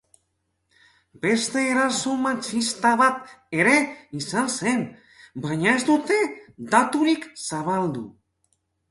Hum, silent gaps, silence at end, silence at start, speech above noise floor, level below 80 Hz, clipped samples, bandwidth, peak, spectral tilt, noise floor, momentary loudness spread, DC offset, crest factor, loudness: none; none; 0.8 s; 1.25 s; 51 dB; -64 dBFS; under 0.1%; 11.5 kHz; -4 dBFS; -4 dB/octave; -74 dBFS; 14 LU; under 0.1%; 20 dB; -22 LUFS